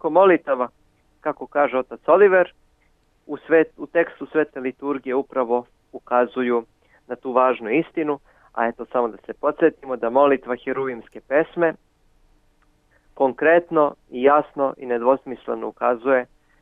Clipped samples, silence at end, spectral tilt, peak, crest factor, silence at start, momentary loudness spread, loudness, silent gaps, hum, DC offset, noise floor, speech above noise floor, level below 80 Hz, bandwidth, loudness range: under 0.1%; 0.4 s; -8.5 dB/octave; -2 dBFS; 18 dB; 0.05 s; 13 LU; -21 LUFS; none; none; under 0.1%; -62 dBFS; 42 dB; -62 dBFS; 3.9 kHz; 3 LU